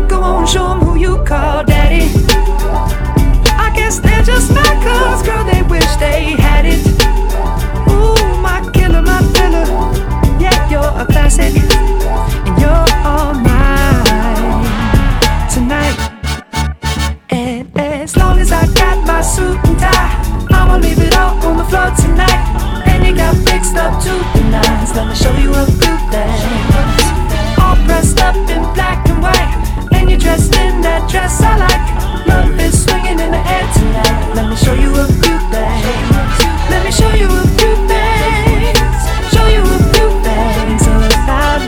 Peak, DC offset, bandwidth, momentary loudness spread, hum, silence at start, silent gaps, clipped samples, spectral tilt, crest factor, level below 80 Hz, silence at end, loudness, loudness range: 0 dBFS; under 0.1%; 17 kHz; 5 LU; none; 0 s; none; 0.3%; -5 dB/octave; 10 dB; -12 dBFS; 0 s; -12 LUFS; 1 LU